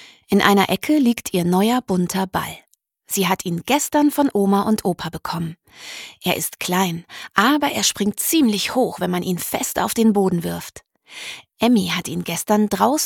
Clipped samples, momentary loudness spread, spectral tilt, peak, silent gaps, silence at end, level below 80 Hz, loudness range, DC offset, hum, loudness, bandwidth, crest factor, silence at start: under 0.1%; 14 LU; -4 dB/octave; 0 dBFS; none; 0 s; -54 dBFS; 2 LU; under 0.1%; none; -19 LUFS; 19 kHz; 20 dB; 0 s